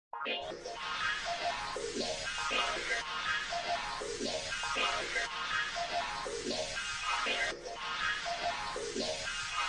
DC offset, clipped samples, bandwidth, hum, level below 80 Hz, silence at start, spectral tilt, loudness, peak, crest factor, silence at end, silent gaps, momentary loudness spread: under 0.1%; under 0.1%; 11.5 kHz; none; -58 dBFS; 0.15 s; -1 dB/octave; -35 LUFS; -18 dBFS; 18 dB; 0 s; none; 6 LU